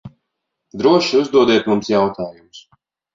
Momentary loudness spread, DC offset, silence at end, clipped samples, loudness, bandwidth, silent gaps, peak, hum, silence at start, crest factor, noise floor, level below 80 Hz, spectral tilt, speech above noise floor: 15 LU; under 0.1%; 0.55 s; under 0.1%; -15 LUFS; 7.6 kHz; none; -2 dBFS; none; 0.05 s; 16 dB; -77 dBFS; -56 dBFS; -5.5 dB/octave; 61 dB